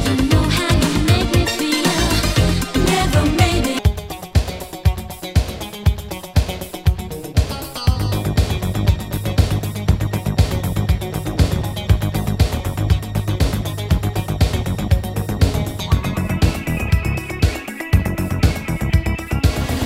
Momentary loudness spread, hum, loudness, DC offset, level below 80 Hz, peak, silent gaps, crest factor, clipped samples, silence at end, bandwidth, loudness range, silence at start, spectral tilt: 6 LU; none; -19 LUFS; under 0.1%; -24 dBFS; 0 dBFS; none; 18 dB; under 0.1%; 0 s; 16.5 kHz; 5 LU; 0 s; -5.5 dB/octave